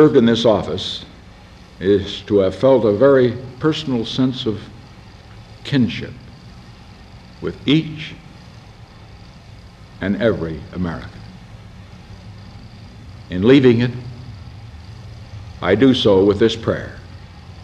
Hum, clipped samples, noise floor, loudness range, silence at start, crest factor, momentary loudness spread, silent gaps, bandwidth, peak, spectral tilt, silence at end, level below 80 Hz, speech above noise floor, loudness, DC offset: none; under 0.1%; -42 dBFS; 9 LU; 0 s; 18 dB; 26 LU; none; 9.2 kHz; 0 dBFS; -7 dB/octave; 0 s; -44 dBFS; 26 dB; -17 LUFS; under 0.1%